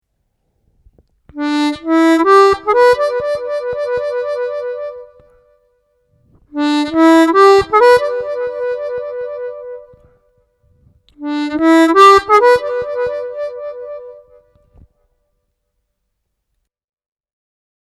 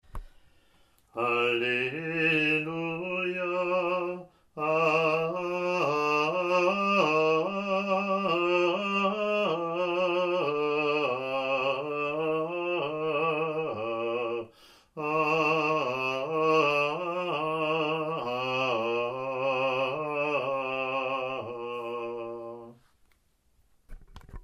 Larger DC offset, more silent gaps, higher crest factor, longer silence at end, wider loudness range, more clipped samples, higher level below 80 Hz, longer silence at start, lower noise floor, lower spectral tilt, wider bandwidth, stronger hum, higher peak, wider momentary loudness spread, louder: neither; neither; about the same, 16 dB vs 16 dB; first, 3.7 s vs 0 s; first, 12 LU vs 5 LU; neither; first, -50 dBFS vs -58 dBFS; first, 1.35 s vs 0.15 s; first, -71 dBFS vs -67 dBFS; second, -4 dB/octave vs -5.5 dB/octave; about the same, 13 kHz vs 13 kHz; neither; first, 0 dBFS vs -12 dBFS; first, 19 LU vs 9 LU; first, -13 LUFS vs -28 LUFS